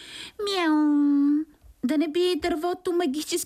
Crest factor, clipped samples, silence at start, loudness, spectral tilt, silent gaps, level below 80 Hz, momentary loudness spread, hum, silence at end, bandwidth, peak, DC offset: 12 dB; under 0.1%; 0 s; -24 LUFS; -3 dB/octave; none; -58 dBFS; 11 LU; none; 0 s; 15 kHz; -12 dBFS; under 0.1%